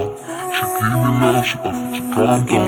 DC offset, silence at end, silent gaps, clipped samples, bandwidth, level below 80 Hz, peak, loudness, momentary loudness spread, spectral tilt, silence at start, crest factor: under 0.1%; 0 s; none; under 0.1%; 18.5 kHz; -46 dBFS; -2 dBFS; -18 LUFS; 8 LU; -5.5 dB/octave; 0 s; 16 dB